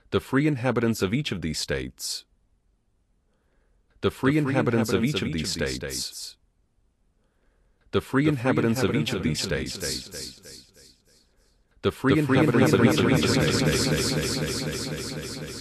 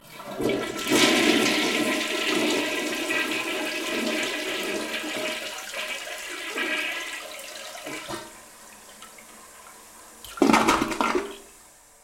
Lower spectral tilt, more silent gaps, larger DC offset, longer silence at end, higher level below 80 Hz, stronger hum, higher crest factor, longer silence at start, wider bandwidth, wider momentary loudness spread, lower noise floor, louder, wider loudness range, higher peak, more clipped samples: first, -5 dB/octave vs -2.5 dB/octave; neither; neither; second, 0 s vs 0.4 s; first, -48 dBFS vs -56 dBFS; neither; about the same, 20 dB vs 22 dB; about the same, 0.1 s vs 0.05 s; second, 14 kHz vs 16.5 kHz; second, 12 LU vs 25 LU; first, -68 dBFS vs -52 dBFS; about the same, -25 LUFS vs -25 LUFS; about the same, 8 LU vs 10 LU; about the same, -6 dBFS vs -6 dBFS; neither